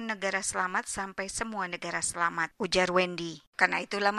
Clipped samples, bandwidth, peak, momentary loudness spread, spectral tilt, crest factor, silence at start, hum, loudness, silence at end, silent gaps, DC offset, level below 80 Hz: under 0.1%; 13.5 kHz; -6 dBFS; 8 LU; -2.5 dB/octave; 24 dB; 0 s; none; -30 LUFS; 0 s; 3.47-3.53 s; under 0.1%; -58 dBFS